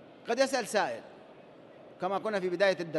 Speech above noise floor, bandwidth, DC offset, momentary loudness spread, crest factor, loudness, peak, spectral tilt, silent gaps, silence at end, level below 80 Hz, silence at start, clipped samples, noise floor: 23 dB; 12.5 kHz; under 0.1%; 11 LU; 18 dB; -31 LUFS; -14 dBFS; -4 dB/octave; none; 0 s; -82 dBFS; 0 s; under 0.1%; -53 dBFS